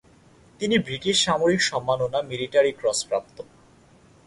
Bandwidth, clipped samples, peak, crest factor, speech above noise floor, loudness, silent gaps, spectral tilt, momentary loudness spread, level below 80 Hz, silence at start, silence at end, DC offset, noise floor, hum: 11.5 kHz; under 0.1%; -8 dBFS; 18 dB; 31 dB; -23 LUFS; none; -3.5 dB/octave; 9 LU; -58 dBFS; 0.6 s; 0.85 s; under 0.1%; -54 dBFS; none